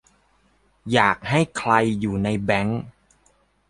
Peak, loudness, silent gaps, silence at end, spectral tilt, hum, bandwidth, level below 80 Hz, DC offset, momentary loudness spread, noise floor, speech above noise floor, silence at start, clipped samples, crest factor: 0 dBFS; -21 LUFS; none; 0.8 s; -6 dB/octave; none; 11.5 kHz; -50 dBFS; under 0.1%; 11 LU; -62 dBFS; 41 dB; 0.85 s; under 0.1%; 22 dB